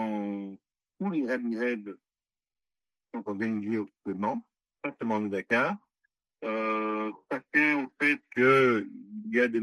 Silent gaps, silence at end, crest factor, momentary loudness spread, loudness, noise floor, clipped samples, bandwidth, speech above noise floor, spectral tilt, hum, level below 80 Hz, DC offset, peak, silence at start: none; 0 s; 18 dB; 15 LU; -29 LUFS; under -90 dBFS; under 0.1%; 12 kHz; over 61 dB; -6.5 dB/octave; none; -80 dBFS; under 0.1%; -12 dBFS; 0 s